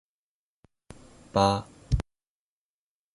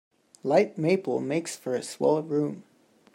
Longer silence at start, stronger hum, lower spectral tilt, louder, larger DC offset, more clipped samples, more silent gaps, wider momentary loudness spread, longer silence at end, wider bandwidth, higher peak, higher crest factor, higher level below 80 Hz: first, 1.35 s vs 0.45 s; neither; about the same, -6 dB/octave vs -6 dB/octave; about the same, -28 LUFS vs -27 LUFS; neither; neither; neither; about the same, 8 LU vs 9 LU; first, 1.15 s vs 0.55 s; second, 11.5 kHz vs 16 kHz; about the same, -8 dBFS vs -8 dBFS; about the same, 24 dB vs 20 dB; first, -42 dBFS vs -76 dBFS